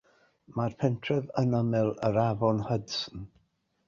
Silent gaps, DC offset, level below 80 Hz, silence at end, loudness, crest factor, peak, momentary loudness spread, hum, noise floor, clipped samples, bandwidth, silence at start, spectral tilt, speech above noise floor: none; under 0.1%; -58 dBFS; 0.6 s; -29 LUFS; 18 dB; -12 dBFS; 12 LU; none; -71 dBFS; under 0.1%; 7.4 kHz; 0.5 s; -7 dB/octave; 43 dB